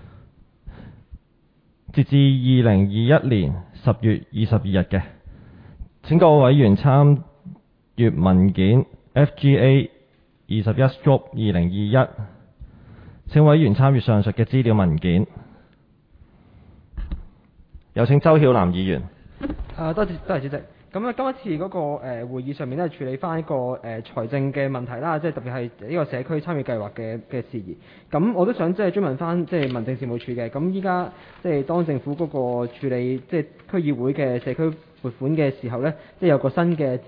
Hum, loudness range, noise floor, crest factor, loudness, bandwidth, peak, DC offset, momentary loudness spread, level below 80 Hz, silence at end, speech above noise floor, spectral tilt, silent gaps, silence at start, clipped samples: none; 9 LU; -60 dBFS; 18 dB; -21 LUFS; 4.9 kHz; -2 dBFS; under 0.1%; 15 LU; -44 dBFS; 0.05 s; 40 dB; -11.5 dB/octave; none; 0.65 s; under 0.1%